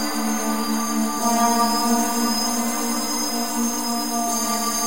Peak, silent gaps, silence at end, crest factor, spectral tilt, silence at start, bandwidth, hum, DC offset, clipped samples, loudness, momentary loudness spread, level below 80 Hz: -6 dBFS; none; 0 s; 16 dB; -2 dB/octave; 0 s; 16 kHz; none; 2%; under 0.1%; -21 LUFS; 4 LU; -54 dBFS